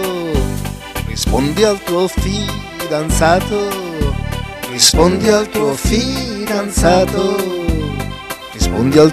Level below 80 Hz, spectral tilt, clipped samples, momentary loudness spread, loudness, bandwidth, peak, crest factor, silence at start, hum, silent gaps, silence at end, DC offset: -24 dBFS; -4.5 dB/octave; under 0.1%; 13 LU; -15 LUFS; 16 kHz; 0 dBFS; 14 dB; 0 s; none; none; 0 s; under 0.1%